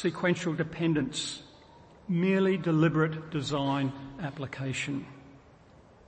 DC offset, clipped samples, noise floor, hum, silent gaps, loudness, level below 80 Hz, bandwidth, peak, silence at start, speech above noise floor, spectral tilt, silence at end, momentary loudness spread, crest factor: under 0.1%; under 0.1%; -56 dBFS; none; none; -30 LUFS; -62 dBFS; 8.8 kHz; -14 dBFS; 0 s; 27 dB; -6 dB/octave; 0.7 s; 13 LU; 18 dB